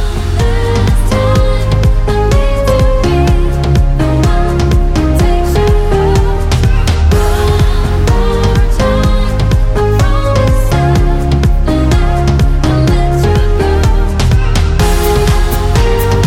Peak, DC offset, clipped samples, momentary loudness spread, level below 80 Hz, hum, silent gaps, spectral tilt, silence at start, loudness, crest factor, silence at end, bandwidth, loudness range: 0 dBFS; under 0.1%; under 0.1%; 2 LU; -12 dBFS; none; none; -6.5 dB/octave; 0 s; -11 LUFS; 8 dB; 0 s; 16.5 kHz; 0 LU